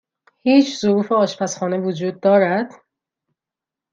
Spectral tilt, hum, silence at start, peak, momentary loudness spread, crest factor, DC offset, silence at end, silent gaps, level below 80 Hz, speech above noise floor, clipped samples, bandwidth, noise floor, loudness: -5.5 dB/octave; none; 0.45 s; -2 dBFS; 8 LU; 18 dB; under 0.1%; 1.25 s; none; -68 dBFS; 70 dB; under 0.1%; 7.6 kHz; -87 dBFS; -18 LUFS